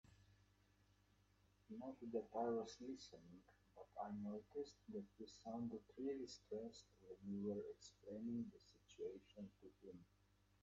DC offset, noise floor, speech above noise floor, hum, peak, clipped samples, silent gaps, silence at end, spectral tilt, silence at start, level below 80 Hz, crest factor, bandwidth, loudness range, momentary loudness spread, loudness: under 0.1%; -77 dBFS; 26 dB; 50 Hz at -75 dBFS; -34 dBFS; under 0.1%; none; 0.6 s; -6.5 dB/octave; 0.05 s; -80 dBFS; 20 dB; 8 kHz; 3 LU; 16 LU; -52 LUFS